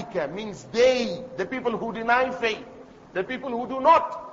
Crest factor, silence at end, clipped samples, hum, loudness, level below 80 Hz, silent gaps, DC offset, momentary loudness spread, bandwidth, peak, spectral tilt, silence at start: 18 dB; 0 s; under 0.1%; none; -24 LUFS; -58 dBFS; none; under 0.1%; 13 LU; 7.8 kHz; -6 dBFS; -4.5 dB/octave; 0 s